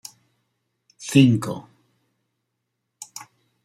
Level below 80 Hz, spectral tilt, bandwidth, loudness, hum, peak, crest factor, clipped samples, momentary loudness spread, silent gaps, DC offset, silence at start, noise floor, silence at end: -66 dBFS; -6 dB/octave; 15 kHz; -19 LUFS; none; -4 dBFS; 22 dB; under 0.1%; 25 LU; none; under 0.1%; 1 s; -78 dBFS; 2.05 s